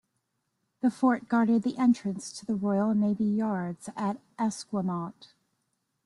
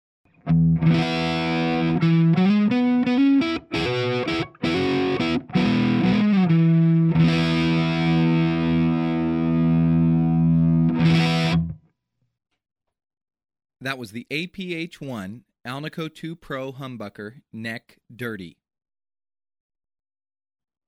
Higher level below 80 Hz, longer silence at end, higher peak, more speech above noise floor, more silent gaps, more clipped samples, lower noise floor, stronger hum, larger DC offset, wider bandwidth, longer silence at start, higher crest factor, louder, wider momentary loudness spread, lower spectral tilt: second, -72 dBFS vs -48 dBFS; second, 0.8 s vs 2.35 s; second, -12 dBFS vs -8 dBFS; first, 51 dB vs 42 dB; neither; neither; first, -79 dBFS vs -74 dBFS; neither; neither; first, 11.5 kHz vs 8.2 kHz; first, 0.85 s vs 0.45 s; about the same, 18 dB vs 14 dB; second, -28 LUFS vs -20 LUFS; second, 9 LU vs 16 LU; about the same, -6.5 dB/octave vs -7.5 dB/octave